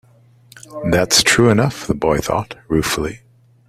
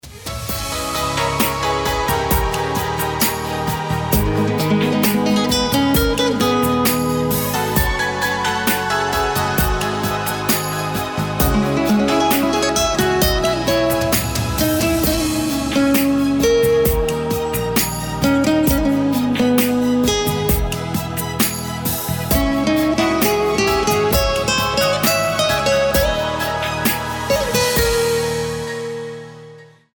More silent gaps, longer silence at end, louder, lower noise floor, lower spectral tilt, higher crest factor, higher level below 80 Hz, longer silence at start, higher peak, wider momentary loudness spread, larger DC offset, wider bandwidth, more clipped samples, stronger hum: neither; first, 0.5 s vs 0.3 s; about the same, -16 LUFS vs -17 LUFS; first, -48 dBFS vs -42 dBFS; about the same, -4 dB/octave vs -4.5 dB/octave; about the same, 18 dB vs 14 dB; second, -40 dBFS vs -30 dBFS; first, 0.55 s vs 0.05 s; first, 0 dBFS vs -4 dBFS; first, 12 LU vs 6 LU; neither; second, 16 kHz vs over 20 kHz; neither; neither